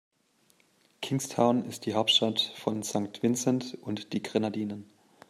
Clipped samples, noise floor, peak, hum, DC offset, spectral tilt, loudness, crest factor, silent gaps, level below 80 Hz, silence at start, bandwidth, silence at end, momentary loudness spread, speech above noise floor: under 0.1%; -67 dBFS; -10 dBFS; none; under 0.1%; -4 dB/octave; -29 LUFS; 20 dB; none; -72 dBFS; 1 s; 15 kHz; 0.45 s; 13 LU; 38 dB